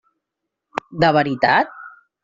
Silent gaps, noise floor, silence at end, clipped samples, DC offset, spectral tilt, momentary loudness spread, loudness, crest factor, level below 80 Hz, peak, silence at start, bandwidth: none; -81 dBFS; 0.35 s; under 0.1%; under 0.1%; -3.5 dB/octave; 14 LU; -17 LUFS; 18 dB; -56 dBFS; -2 dBFS; 0.75 s; 7.6 kHz